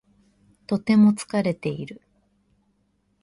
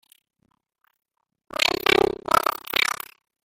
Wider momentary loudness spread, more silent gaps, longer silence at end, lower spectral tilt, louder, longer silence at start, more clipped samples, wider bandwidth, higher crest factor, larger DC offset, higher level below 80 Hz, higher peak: first, 16 LU vs 13 LU; neither; first, 1.3 s vs 0.5 s; first, -7 dB/octave vs -2 dB/octave; about the same, -22 LUFS vs -22 LUFS; second, 0.7 s vs 1.6 s; neither; second, 11.5 kHz vs 17 kHz; second, 18 dB vs 24 dB; neither; second, -64 dBFS vs -54 dBFS; second, -8 dBFS vs -2 dBFS